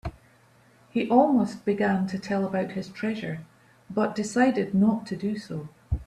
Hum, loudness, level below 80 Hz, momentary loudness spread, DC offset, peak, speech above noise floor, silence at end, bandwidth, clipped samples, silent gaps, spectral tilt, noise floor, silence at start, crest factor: none; -26 LUFS; -46 dBFS; 12 LU; under 0.1%; -6 dBFS; 33 dB; 0 s; 11 kHz; under 0.1%; none; -7 dB/octave; -58 dBFS; 0.05 s; 20 dB